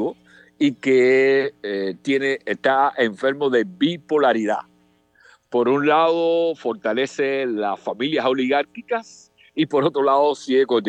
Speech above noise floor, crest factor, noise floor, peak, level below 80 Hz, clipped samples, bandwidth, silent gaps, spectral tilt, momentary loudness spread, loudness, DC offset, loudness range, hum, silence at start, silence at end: 39 dB; 16 dB; -58 dBFS; -4 dBFS; -74 dBFS; under 0.1%; 8.8 kHz; none; -5.5 dB/octave; 9 LU; -20 LUFS; under 0.1%; 3 LU; none; 0 s; 0 s